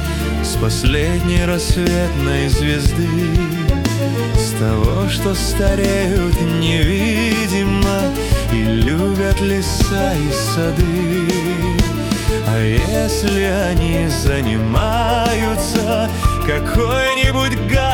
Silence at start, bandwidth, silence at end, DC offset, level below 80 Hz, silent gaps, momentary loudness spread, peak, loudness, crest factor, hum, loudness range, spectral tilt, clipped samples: 0 s; 18 kHz; 0 s; under 0.1%; -22 dBFS; none; 2 LU; -2 dBFS; -17 LUFS; 12 dB; none; 1 LU; -5.5 dB/octave; under 0.1%